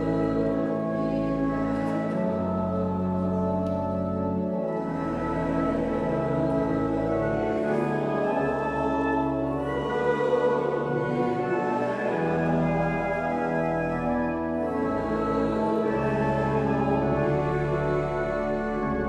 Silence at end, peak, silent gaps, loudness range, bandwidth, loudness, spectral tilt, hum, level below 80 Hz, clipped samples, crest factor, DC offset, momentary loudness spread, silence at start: 0 s; -12 dBFS; none; 2 LU; 10.5 kHz; -26 LUFS; -8.5 dB/octave; none; -44 dBFS; under 0.1%; 12 dB; under 0.1%; 3 LU; 0 s